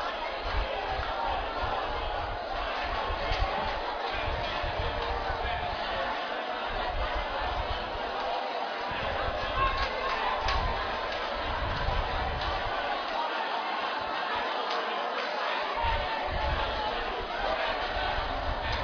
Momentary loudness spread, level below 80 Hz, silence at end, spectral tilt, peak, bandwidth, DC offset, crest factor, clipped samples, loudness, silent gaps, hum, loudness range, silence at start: 3 LU; -38 dBFS; 0 s; -5 dB/octave; -14 dBFS; 5.4 kHz; under 0.1%; 16 dB; under 0.1%; -31 LUFS; none; none; 2 LU; 0 s